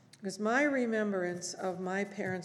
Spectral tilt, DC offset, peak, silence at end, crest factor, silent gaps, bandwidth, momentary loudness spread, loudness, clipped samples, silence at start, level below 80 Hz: -5 dB/octave; under 0.1%; -16 dBFS; 0 s; 18 dB; none; 12.5 kHz; 8 LU; -33 LUFS; under 0.1%; 0.2 s; -86 dBFS